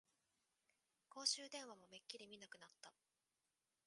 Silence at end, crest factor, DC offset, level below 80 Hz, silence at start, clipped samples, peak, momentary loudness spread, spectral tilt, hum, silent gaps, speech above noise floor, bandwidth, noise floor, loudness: 0.95 s; 30 dB; under 0.1%; under -90 dBFS; 1.1 s; under 0.1%; -24 dBFS; 21 LU; 0.5 dB/octave; none; none; over 38 dB; 11.5 kHz; under -90 dBFS; -47 LUFS